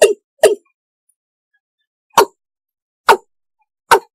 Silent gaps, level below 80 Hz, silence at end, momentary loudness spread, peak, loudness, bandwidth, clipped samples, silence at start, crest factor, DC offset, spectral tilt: 0.24-0.37 s, 0.74-1.07 s, 1.16-1.51 s, 1.60-1.78 s, 1.87-2.10 s, 2.82-3.04 s; -60 dBFS; 0.15 s; 5 LU; 0 dBFS; -15 LUFS; 16 kHz; under 0.1%; 0 s; 18 dB; under 0.1%; -1.5 dB/octave